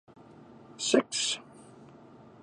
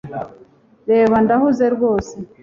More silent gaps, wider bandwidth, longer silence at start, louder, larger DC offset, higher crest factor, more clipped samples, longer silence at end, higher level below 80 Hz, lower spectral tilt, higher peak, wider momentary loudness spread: neither; first, 11.5 kHz vs 7.4 kHz; first, 0.5 s vs 0.05 s; second, -29 LUFS vs -16 LUFS; neither; first, 26 dB vs 14 dB; neither; first, 0.6 s vs 0.15 s; second, -76 dBFS vs -48 dBFS; second, -2 dB/octave vs -7.5 dB/octave; second, -8 dBFS vs -4 dBFS; second, 12 LU vs 18 LU